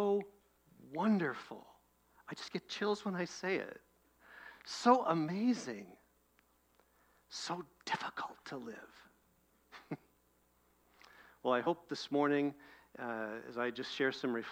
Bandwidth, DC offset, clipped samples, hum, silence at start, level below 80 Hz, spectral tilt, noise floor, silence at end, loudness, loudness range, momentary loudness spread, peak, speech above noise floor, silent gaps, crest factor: 16.5 kHz; under 0.1%; under 0.1%; none; 0 s; -80 dBFS; -5 dB/octave; -73 dBFS; 0 s; -37 LUFS; 9 LU; 19 LU; -14 dBFS; 36 dB; none; 24 dB